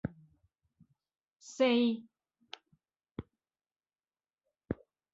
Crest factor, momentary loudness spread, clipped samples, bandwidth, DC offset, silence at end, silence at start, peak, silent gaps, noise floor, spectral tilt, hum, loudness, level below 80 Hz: 20 dB; 24 LU; under 0.1%; 7.8 kHz; under 0.1%; 0.4 s; 0.05 s; -18 dBFS; none; under -90 dBFS; -5.5 dB/octave; none; -33 LUFS; -64 dBFS